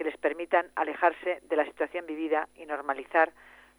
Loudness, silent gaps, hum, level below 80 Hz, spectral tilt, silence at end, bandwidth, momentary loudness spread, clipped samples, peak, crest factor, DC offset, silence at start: -29 LUFS; none; none; -70 dBFS; -4 dB/octave; 0.5 s; over 20 kHz; 8 LU; under 0.1%; -10 dBFS; 20 dB; under 0.1%; 0 s